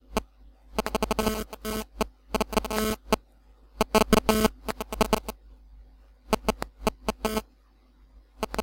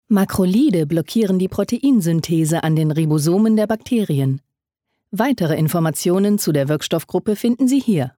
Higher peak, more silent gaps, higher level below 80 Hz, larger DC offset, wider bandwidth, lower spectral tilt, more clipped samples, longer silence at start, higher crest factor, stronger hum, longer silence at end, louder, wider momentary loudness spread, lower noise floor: about the same, -6 dBFS vs -4 dBFS; neither; first, -40 dBFS vs -52 dBFS; neither; about the same, 17 kHz vs 18.5 kHz; second, -4 dB/octave vs -6.5 dB/octave; neither; about the same, 0.1 s vs 0.1 s; first, 24 dB vs 12 dB; neither; about the same, 0 s vs 0.1 s; second, -28 LUFS vs -18 LUFS; first, 12 LU vs 5 LU; second, -59 dBFS vs -77 dBFS